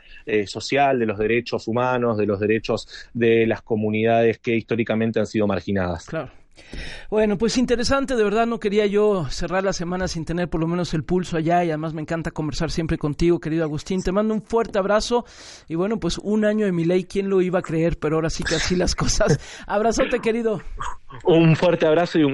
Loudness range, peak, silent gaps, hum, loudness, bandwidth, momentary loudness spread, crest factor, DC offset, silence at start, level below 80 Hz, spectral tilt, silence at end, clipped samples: 2 LU; -6 dBFS; none; none; -22 LUFS; 11.5 kHz; 8 LU; 16 dB; under 0.1%; 0.1 s; -38 dBFS; -5.5 dB/octave; 0 s; under 0.1%